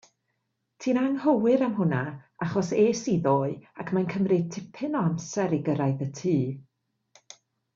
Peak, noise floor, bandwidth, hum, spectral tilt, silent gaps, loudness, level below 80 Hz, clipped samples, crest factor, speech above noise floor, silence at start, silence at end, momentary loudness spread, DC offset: -10 dBFS; -78 dBFS; 7.6 kHz; none; -7 dB/octave; none; -26 LUFS; -66 dBFS; under 0.1%; 16 dB; 52 dB; 0.8 s; 1.15 s; 10 LU; under 0.1%